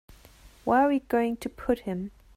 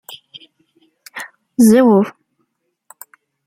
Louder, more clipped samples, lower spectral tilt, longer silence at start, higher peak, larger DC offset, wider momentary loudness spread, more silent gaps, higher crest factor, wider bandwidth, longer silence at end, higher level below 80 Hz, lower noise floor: second, -27 LUFS vs -13 LUFS; neither; about the same, -6.5 dB/octave vs -6 dB/octave; first, 0.45 s vs 0.1 s; second, -12 dBFS vs -2 dBFS; neither; second, 12 LU vs 25 LU; neither; about the same, 16 dB vs 16 dB; about the same, 15.5 kHz vs 16 kHz; second, 0.25 s vs 1.35 s; first, -52 dBFS vs -62 dBFS; second, -53 dBFS vs -69 dBFS